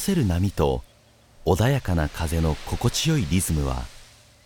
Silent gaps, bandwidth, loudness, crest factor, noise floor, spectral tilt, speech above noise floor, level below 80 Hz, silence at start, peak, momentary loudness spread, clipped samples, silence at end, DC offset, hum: none; 19 kHz; -24 LUFS; 18 dB; -54 dBFS; -5.5 dB/octave; 32 dB; -36 dBFS; 0 s; -6 dBFS; 8 LU; under 0.1%; 0.4 s; under 0.1%; none